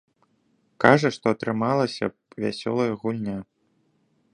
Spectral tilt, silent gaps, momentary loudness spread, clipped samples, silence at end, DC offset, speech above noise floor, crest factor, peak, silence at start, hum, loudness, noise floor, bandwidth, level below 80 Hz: -6.5 dB/octave; none; 13 LU; under 0.1%; 0.9 s; under 0.1%; 45 dB; 24 dB; 0 dBFS; 0.8 s; none; -24 LUFS; -68 dBFS; 11 kHz; -62 dBFS